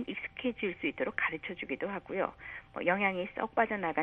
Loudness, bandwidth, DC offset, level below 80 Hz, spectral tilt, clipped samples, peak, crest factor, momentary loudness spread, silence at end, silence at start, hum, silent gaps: -34 LUFS; 4.5 kHz; under 0.1%; -64 dBFS; -8 dB/octave; under 0.1%; -12 dBFS; 22 dB; 8 LU; 0 s; 0 s; none; none